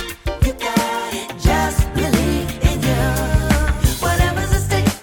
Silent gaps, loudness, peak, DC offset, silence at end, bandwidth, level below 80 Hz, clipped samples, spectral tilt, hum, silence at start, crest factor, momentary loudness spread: none; -18 LUFS; -2 dBFS; under 0.1%; 0 s; 19 kHz; -22 dBFS; under 0.1%; -5 dB/octave; none; 0 s; 14 dB; 4 LU